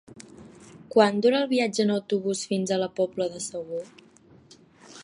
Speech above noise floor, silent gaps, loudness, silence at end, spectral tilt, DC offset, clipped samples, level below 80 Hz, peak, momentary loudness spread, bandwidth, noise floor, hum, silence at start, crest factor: 30 dB; none; -25 LUFS; 0 s; -4.5 dB/octave; under 0.1%; under 0.1%; -70 dBFS; -4 dBFS; 15 LU; 11.5 kHz; -55 dBFS; none; 0.1 s; 22 dB